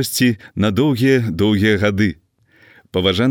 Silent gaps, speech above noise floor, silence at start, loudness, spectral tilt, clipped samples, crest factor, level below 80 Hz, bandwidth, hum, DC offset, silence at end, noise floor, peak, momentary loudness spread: none; 36 dB; 0 s; -17 LUFS; -5.5 dB/octave; under 0.1%; 16 dB; -48 dBFS; 18.5 kHz; none; under 0.1%; 0 s; -52 dBFS; -2 dBFS; 5 LU